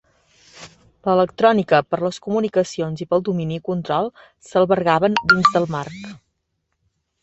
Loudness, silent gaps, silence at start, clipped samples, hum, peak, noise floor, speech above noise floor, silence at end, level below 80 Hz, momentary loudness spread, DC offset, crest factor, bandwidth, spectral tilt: -19 LUFS; none; 0.55 s; under 0.1%; none; -2 dBFS; -74 dBFS; 55 dB; 1.05 s; -56 dBFS; 13 LU; under 0.1%; 18 dB; 8.2 kHz; -6 dB/octave